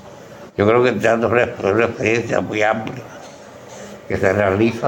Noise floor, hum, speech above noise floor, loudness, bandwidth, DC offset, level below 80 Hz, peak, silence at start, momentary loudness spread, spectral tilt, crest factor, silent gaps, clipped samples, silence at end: -38 dBFS; none; 21 dB; -17 LUFS; 17 kHz; under 0.1%; -54 dBFS; -2 dBFS; 0 s; 22 LU; -6 dB/octave; 18 dB; none; under 0.1%; 0 s